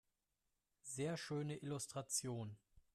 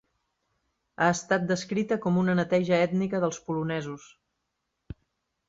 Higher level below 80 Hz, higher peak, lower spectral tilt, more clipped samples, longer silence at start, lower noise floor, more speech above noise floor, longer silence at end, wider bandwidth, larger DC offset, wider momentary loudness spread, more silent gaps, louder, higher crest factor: second, -78 dBFS vs -62 dBFS; second, -30 dBFS vs -8 dBFS; second, -4 dB/octave vs -6 dB/octave; neither; second, 0.85 s vs 1 s; first, -88 dBFS vs -81 dBFS; second, 43 dB vs 54 dB; second, 0.15 s vs 0.55 s; first, 15 kHz vs 8 kHz; neither; second, 12 LU vs 21 LU; neither; second, -45 LUFS vs -27 LUFS; about the same, 18 dB vs 20 dB